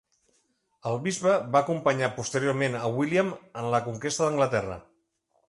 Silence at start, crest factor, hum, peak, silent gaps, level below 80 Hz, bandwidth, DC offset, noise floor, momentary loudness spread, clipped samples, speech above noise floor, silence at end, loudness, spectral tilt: 0.85 s; 20 dB; none; -8 dBFS; none; -62 dBFS; 11.5 kHz; under 0.1%; -72 dBFS; 9 LU; under 0.1%; 46 dB; 0.65 s; -27 LUFS; -5 dB/octave